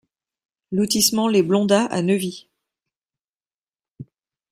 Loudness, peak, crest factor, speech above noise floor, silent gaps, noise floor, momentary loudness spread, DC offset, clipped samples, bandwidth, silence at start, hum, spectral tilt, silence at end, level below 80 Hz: -19 LUFS; -2 dBFS; 20 dB; over 71 dB; 2.97-3.02 s, 3.24-3.33 s, 3.54-3.62 s; under -90 dBFS; 11 LU; under 0.1%; under 0.1%; 16 kHz; 0.7 s; none; -4 dB/octave; 0.5 s; -62 dBFS